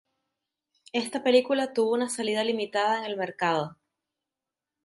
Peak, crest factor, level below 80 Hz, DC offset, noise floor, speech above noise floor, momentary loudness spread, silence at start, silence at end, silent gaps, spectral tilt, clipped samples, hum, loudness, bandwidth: -10 dBFS; 20 dB; -78 dBFS; under 0.1%; -89 dBFS; 63 dB; 9 LU; 0.95 s; 1.1 s; none; -3.5 dB/octave; under 0.1%; none; -27 LUFS; 11.5 kHz